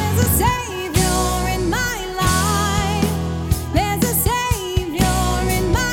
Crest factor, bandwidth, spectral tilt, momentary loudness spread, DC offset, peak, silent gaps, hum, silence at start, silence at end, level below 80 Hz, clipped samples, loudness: 16 dB; 17 kHz; -4.5 dB/octave; 5 LU; under 0.1%; -2 dBFS; none; none; 0 s; 0 s; -26 dBFS; under 0.1%; -19 LUFS